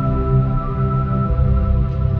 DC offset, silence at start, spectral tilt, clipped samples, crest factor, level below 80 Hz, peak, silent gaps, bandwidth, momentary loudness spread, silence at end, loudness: under 0.1%; 0 s; -12 dB/octave; under 0.1%; 12 dB; -20 dBFS; -4 dBFS; none; 4.1 kHz; 3 LU; 0 s; -18 LUFS